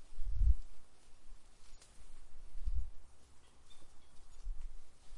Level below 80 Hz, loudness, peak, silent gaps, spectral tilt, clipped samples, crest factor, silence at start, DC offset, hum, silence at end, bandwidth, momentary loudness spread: -42 dBFS; -43 LUFS; -16 dBFS; none; -5.5 dB/octave; under 0.1%; 20 dB; 0 s; under 0.1%; none; 0 s; 10.5 kHz; 28 LU